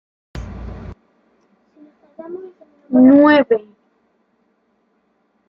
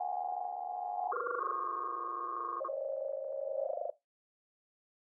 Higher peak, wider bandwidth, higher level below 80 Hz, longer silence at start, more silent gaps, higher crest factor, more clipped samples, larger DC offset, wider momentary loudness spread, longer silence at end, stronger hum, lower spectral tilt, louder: first, -2 dBFS vs -24 dBFS; first, 5.6 kHz vs 2.1 kHz; first, -42 dBFS vs under -90 dBFS; first, 0.35 s vs 0 s; neither; about the same, 18 dB vs 14 dB; neither; neither; first, 27 LU vs 4 LU; first, 1.9 s vs 1.2 s; neither; first, -8 dB/octave vs 8.5 dB/octave; first, -12 LUFS vs -38 LUFS